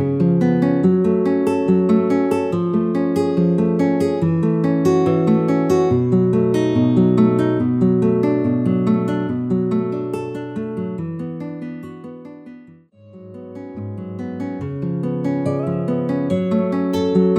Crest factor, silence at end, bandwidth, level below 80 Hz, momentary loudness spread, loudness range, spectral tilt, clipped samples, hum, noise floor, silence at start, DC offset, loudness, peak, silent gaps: 14 dB; 0 s; 11 kHz; -56 dBFS; 14 LU; 14 LU; -9 dB/octave; under 0.1%; none; -45 dBFS; 0 s; under 0.1%; -18 LUFS; -2 dBFS; none